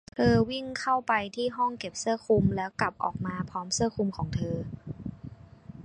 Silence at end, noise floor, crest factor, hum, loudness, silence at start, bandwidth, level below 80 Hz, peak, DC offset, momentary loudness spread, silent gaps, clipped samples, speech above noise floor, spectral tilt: 0 s; -48 dBFS; 20 dB; none; -29 LUFS; 0.15 s; 11.5 kHz; -50 dBFS; -10 dBFS; under 0.1%; 15 LU; none; under 0.1%; 19 dB; -5 dB/octave